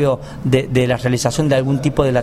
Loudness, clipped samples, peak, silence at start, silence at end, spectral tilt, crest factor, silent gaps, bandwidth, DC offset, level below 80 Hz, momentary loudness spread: -17 LUFS; under 0.1%; 0 dBFS; 0 s; 0 s; -6 dB/octave; 16 dB; none; 13.5 kHz; under 0.1%; -36 dBFS; 2 LU